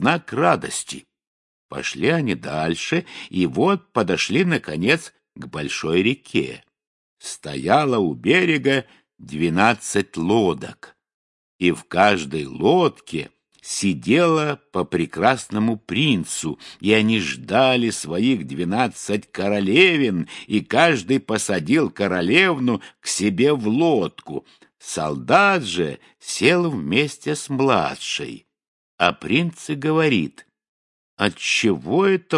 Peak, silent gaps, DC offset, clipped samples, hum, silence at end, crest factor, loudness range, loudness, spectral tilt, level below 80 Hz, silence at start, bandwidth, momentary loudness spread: 0 dBFS; 1.27-1.69 s, 6.87-7.17 s, 11.14-11.59 s, 28.68-28.98 s, 30.69-31.17 s; under 0.1%; under 0.1%; none; 0 s; 20 dB; 4 LU; -20 LUFS; -4.5 dB/octave; -60 dBFS; 0 s; 11.5 kHz; 13 LU